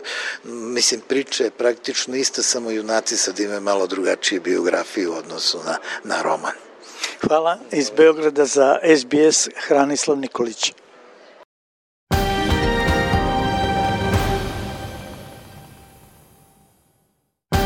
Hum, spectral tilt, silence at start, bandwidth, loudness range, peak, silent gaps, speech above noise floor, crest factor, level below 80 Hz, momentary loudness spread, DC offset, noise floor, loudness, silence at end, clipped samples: none; -3.5 dB/octave; 0 s; 16.5 kHz; 7 LU; -2 dBFS; 11.45-12.07 s; 49 dB; 18 dB; -38 dBFS; 13 LU; under 0.1%; -68 dBFS; -19 LUFS; 0 s; under 0.1%